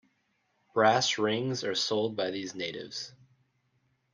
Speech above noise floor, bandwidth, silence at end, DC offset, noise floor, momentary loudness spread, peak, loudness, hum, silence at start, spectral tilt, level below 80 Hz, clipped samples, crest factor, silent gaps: 45 dB; 10 kHz; 1.05 s; under 0.1%; -75 dBFS; 14 LU; -10 dBFS; -29 LUFS; none; 0.75 s; -3.5 dB/octave; -76 dBFS; under 0.1%; 22 dB; none